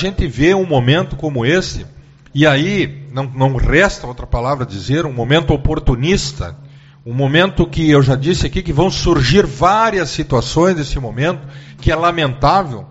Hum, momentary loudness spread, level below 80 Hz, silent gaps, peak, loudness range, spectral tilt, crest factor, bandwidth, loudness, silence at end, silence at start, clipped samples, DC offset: none; 11 LU; -26 dBFS; none; 0 dBFS; 3 LU; -5 dB/octave; 14 dB; 8 kHz; -15 LUFS; 0 s; 0 s; under 0.1%; under 0.1%